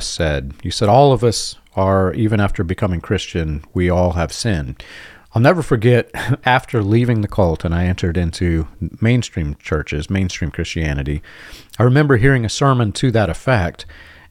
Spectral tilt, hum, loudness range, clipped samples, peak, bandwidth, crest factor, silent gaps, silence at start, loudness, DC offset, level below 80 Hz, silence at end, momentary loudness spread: -6 dB/octave; none; 4 LU; under 0.1%; 0 dBFS; 14.5 kHz; 16 dB; none; 0 s; -17 LUFS; under 0.1%; -34 dBFS; 0.3 s; 11 LU